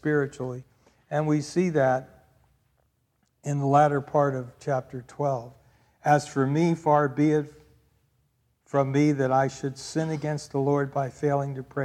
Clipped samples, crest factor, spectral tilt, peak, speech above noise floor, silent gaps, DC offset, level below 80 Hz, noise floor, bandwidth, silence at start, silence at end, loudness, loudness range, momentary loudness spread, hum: under 0.1%; 18 dB; -7 dB/octave; -8 dBFS; 46 dB; none; under 0.1%; -64 dBFS; -71 dBFS; 11.5 kHz; 0.05 s; 0 s; -26 LUFS; 2 LU; 10 LU; none